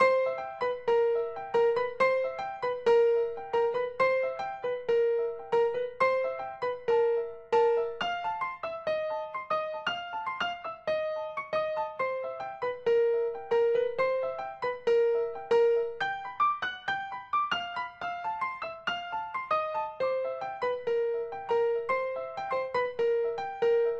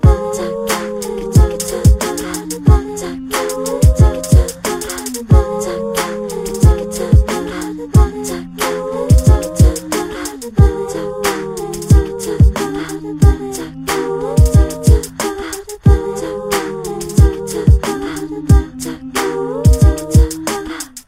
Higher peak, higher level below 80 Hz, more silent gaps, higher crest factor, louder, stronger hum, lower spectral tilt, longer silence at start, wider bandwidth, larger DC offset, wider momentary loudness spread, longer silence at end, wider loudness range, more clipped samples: second, -12 dBFS vs 0 dBFS; second, -68 dBFS vs -18 dBFS; neither; about the same, 18 dB vs 14 dB; second, -30 LUFS vs -15 LUFS; neither; second, -4 dB/octave vs -6 dB/octave; about the same, 0 s vs 0.05 s; second, 7 kHz vs 16.5 kHz; neither; second, 8 LU vs 11 LU; about the same, 0 s vs 0.1 s; first, 5 LU vs 2 LU; neither